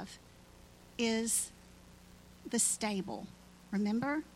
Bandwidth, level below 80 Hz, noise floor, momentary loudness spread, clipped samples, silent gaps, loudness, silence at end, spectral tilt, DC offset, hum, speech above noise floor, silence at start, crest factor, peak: 16.5 kHz; -64 dBFS; -58 dBFS; 19 LU; under 0.1%; none; -34 LUFS; 0.05 s; -3 dB/octave; under 0.1%; 60 Hz at -60 dBFS; 24 dB; 0 s; 20 dB; -18 dBFS